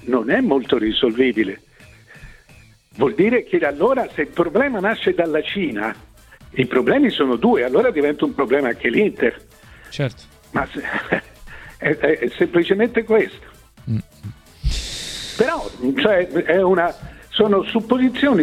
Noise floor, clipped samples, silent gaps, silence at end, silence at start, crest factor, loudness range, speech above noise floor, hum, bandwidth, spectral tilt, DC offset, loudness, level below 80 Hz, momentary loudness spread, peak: -48 dBFS; under 0.1%; none; 0 s; 0 s; 18 dB; 4 LU; 30 dB; none; 14.5 kHz; -6 dB/octave; under 0.1%; -19 LUFS; -40 dBFS; 10 LU; -2 dBFS